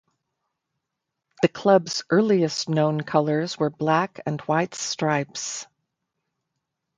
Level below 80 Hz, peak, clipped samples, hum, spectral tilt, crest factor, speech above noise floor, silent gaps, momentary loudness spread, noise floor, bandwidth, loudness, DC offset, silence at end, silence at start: -68 dBFS; -2 dBFS; under 0.1%; none; -5 dB/octave; 22 dB; 60 dB; none; 9 LU; -82 dBFS; 9.6 kHz; -23 LUFS; under 0.1%; 1.35 s; 1.4 s